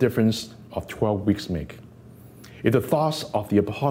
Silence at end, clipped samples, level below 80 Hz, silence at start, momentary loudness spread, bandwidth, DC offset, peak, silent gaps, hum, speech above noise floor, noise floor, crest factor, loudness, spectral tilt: 0 s; under 0.1%; -50 dBFS; 0 s; 13 LU; 16 kHz; under 0.1%; -6 dBFS; none; none; 23 dB; -46 dBFS; 18 dB; -24 LUFS; -6.5 dB/octave